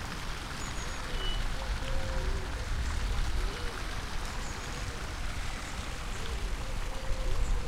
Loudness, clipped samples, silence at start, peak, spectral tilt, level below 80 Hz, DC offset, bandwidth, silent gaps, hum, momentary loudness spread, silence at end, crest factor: -37 LUFS; under 0.1%; 0 s; -18 dBFS; -4 dB/octave; -34 dBFS; under 0.1%; 15 kHz; none; none; 4 LU; 0 s; 14 dB